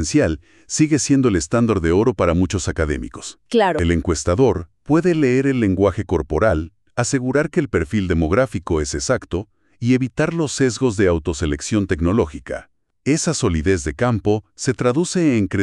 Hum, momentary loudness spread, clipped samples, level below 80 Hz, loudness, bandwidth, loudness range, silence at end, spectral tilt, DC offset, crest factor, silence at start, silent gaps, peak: none; 8 LU; under 0.1%; -34 dBFS; -19 LUFS; 11.5 kHz; 2 LU; 0 s; -5.5 dB/octave; under 0.1%; 16 dB; 0 s; none; -4 dBFS